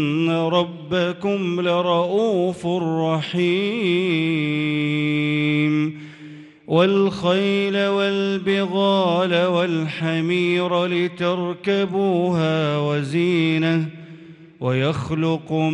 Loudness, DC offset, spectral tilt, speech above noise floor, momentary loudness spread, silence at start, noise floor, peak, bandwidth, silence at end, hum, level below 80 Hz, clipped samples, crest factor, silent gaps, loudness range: -20 LUFS; under 0.1%; -7 dB/octave; 22 dB; 4 LU; 0 s; -42 dBFS; -6 dBFS; 10.5 kHz; 0 s; none; -60 dBFS; under 0.1%; 14 dB; none; 2 LU